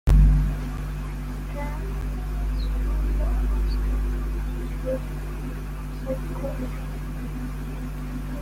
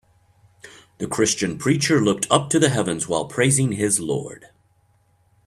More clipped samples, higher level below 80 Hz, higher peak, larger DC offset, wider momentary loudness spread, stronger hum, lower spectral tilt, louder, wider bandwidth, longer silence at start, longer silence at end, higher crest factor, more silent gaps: neither; first, -26 dBFS vs -56 dBFS; second, -8 dBFS vs -2 dBFS; neither; about the same, 7 LU vs 9 LU; first, 50 Hz at -30 dBFS vs none; first, -7.5 dB/octave vs -4 dB/octave; second, -29 LUFS vs -20 LUFS; about the same, 15 kHz vs 14 kHz; second, 0.05 s vs 0.65 s; second, 0 s vs 1 s; about the same, 16 dB vs 20 dB; neither